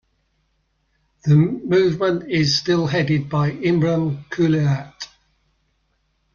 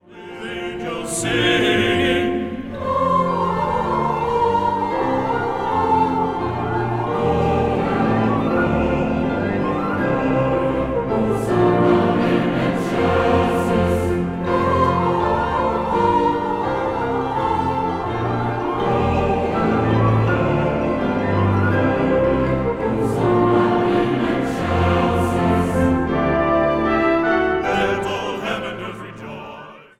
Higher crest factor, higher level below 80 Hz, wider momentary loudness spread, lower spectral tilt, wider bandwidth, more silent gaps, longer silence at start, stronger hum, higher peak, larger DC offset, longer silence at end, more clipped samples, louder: about the same, 16 dB vs 14 dB; second, -54 dBFS vs -38 dBFS; first, 9 LU vs 6 LU; about the same, -6.5 dB/octave vs -6.5 dB/octave; second, 7.2 kHz vs 14 kHz; neither; first, 1.25 s vs 0.1 s; neither; about the same, -6 dBFS vs -4 dBFS; neither; first, 1.3 s vs 0.15 s; neither; about the same, -19 LUFS vs -19 LUFS